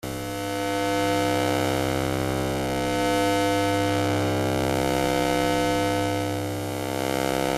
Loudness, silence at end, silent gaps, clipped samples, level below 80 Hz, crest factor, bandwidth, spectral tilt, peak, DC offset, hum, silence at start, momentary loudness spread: -24 LUFS; 0 s; none; under 0.1%; -46 dBFS; 16 dB; 16 kHz; -5 dB/octave; -8 dBFS; under 0.1%; none; 0.05 s; 5 LU